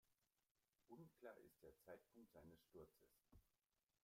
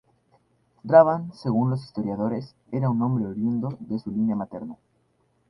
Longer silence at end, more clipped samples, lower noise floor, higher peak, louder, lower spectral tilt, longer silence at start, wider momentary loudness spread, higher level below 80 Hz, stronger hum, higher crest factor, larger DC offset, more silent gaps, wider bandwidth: second, 0.45 s vs 0.75 s; neither; first, under -90 dBFS vs -67 dBFS; second, -48 dBFS vs -2 dBFS; second, -67 LUFS vs -24 LUFS; second, -6 dB/octave vs -10 dB/octave; second, 0.05 s vs 0.85 s; second, 5 LU vs 16 LU; second, -86 dBFS vs -62 dBFS; neither; about the same, 22 dB vs 22 dB; neither; first, 0.51-0.55 s vs none; first, 16 kHz vs 10 kHz